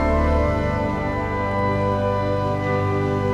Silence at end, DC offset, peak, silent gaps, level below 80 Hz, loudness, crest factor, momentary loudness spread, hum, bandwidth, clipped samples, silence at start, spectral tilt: 0 s; under 0.1%; -8 dBFS; none; -30 dBFS; -22 LUFS; 14 dB; 4 LU; 50 Hz at -30 dBFS; 9.6 kHz; under 0.1%; 0 s; -8 dB/octave